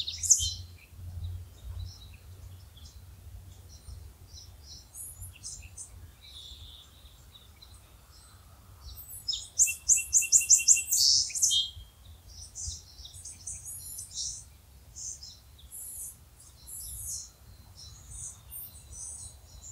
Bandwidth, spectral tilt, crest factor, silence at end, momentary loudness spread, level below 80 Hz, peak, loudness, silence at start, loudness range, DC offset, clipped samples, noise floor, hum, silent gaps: 16 kHz; 1.5 dB/octave; 28 dB; 0 s; 28 LU; -52 dBFS; -6 dBFS; -25 LUFS; 0 s; 25 LU; under 0.1%; under 0.1%; -54 dBFS; none; none